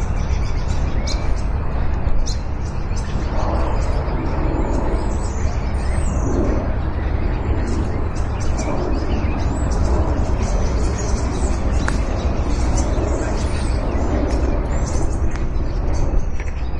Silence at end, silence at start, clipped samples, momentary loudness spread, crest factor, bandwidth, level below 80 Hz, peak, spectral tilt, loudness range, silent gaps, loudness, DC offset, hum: 0 s; 0 s; under 0.1%; 4 LU; 16 dB; 10 kHz; -20 dBFS; -2 dBFS; -6.5 dB/octave; 2 LU; none; -22 LUFS; under 0.1%; none